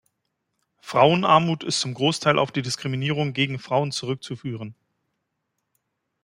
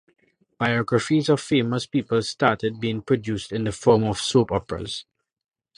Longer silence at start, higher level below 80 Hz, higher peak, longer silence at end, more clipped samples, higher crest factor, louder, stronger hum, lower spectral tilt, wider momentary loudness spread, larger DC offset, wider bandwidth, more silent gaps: first, 0.85 s vs 0.6 s; second, -66 dBFS vs -50 dBFS; about the same, -2 dBFS vs -2 dBFS; first, 1.5 s vs 0.75 s; neither; about the same, 22 dB vs 22 dB; about the same, -22 LUFS vs -23 LUFS; neither; about the same, -5 dB/octave vs -5.5 dB/octave; first, 14 LU vs 8 LU; neither; first, 15.5 kHz vs 11.5 kHz; neither